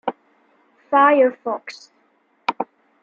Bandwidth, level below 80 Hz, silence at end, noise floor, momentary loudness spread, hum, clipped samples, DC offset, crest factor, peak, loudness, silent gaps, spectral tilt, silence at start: 7.4 kHz; -80 dBFS; 0.4 s; -62 dBFS; 18 LU; none; under 0.1%; under 0.1%; 20 dB; -2 dBFS; -19 LUFS; none; -4.5 dB/octave; 0.05 s